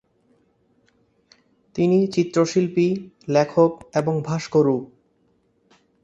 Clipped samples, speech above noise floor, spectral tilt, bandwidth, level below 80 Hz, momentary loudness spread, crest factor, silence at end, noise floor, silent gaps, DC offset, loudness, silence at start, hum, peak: under 0.1%; 44 dB; -7 dB/octave; 8.2 kHz; -62 dBFS; 6 LU; 20 dB; 1.2 s; -64 dBFS; none; under 0.1%; -21 LUFS; 1.75 s; none; -4 dBFS